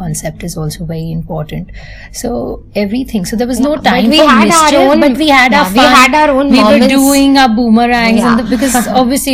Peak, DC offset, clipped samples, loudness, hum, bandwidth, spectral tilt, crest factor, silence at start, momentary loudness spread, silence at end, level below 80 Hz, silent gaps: 0 dBFS; under 0.1%; 1%; -8 LUFS; none; 16.5 kHz; -4 dB/octave; 10 dB; 0 s; 14 LU; 0 s; -32 dBFS; none